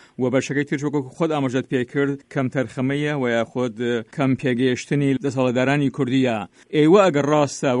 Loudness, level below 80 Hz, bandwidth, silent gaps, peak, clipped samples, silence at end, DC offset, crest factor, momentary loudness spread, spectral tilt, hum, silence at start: -21 LUFS; -62 dBFS; 11 kHz; none; -4 dBFS; under 0.1%; 0 s; under 0.1%; 16 dB; 8 LU; -6.5 dB/octave; none; 0.2 s